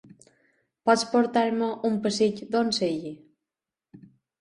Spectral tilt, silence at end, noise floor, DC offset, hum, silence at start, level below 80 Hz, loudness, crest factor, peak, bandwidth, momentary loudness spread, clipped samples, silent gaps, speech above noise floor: -4.5 dB/octave; 0.4 s; -89 dBFS; under 0.1%; none; 0.85 s; -70 dBFS; -25 LUFS; 20 dB; -8 dBFS; 11 kHz; 7 LU; under 0.1%; none; 65 dB